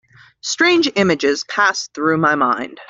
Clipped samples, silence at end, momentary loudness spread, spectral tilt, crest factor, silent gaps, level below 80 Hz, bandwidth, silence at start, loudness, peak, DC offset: under 0.1%; 0.05 s; 6 LU; -3.5 dB/octave; 16 dB; none; -60 dBFS; 7.8 kHz; 0.45 s; -16 LUFS; -2 dBFS; under 0.1%